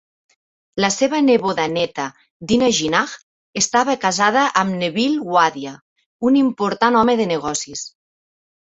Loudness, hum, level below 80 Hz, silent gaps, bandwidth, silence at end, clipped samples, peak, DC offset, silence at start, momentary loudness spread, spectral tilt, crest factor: -18 LUFS; none; -56 dBFS; 2.30-2.40 s, 3.23-3.53 s, 5.81-5.96 s, 6.06-6.19 s; 8.2 kHz; 0.85 s; under 0.1%; -2 dBFS; under 0.1%; 0.75 s; 15 LU; -3.5 dB/octave; 18 dB